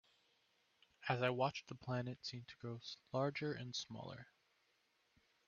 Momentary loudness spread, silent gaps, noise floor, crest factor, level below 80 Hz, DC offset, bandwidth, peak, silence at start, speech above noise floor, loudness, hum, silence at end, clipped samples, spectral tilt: 12 LU; none; -80 dBFS; 24 dB; -80 dBFS; under 0.1%; 7.2 kHz; -22 dBFS; 1 s; 36 dB; -44 LUFS; none; 1.25 s; under 0.1%; -4 dB/octave